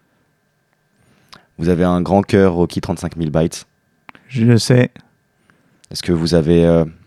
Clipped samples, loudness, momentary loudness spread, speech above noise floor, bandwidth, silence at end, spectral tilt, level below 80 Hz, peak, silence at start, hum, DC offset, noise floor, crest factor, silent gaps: under 0.1%; -16 LUFS; 11 LU; 48 dB; 13 kHz; 0.15 s; -6.5 dB/octave; -40 dBFS; 0 dBFS; 1.6 s; none; under 0.1%; -63 dBFS; 16 dB; none